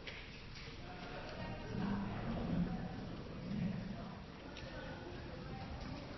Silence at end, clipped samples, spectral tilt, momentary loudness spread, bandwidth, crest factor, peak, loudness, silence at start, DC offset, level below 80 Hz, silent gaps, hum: 0 s; under 0.1%; -5.5 dB/octave; 10 LU; 6 kHz; 18 dB; -26 dBFS; -45 LUFS; 0 s; under 0.1%; -54 dBFS; none; none